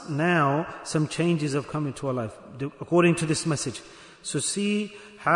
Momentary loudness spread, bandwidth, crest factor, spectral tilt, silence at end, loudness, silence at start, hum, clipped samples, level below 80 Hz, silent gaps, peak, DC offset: 14 LU; 11 kHz; 18 dB; -5 dB/octave; 0 s; -26 LUFS; 0 s; none; under 0.1%; -62 dBFS; none; -8 dBFS; under 0.1%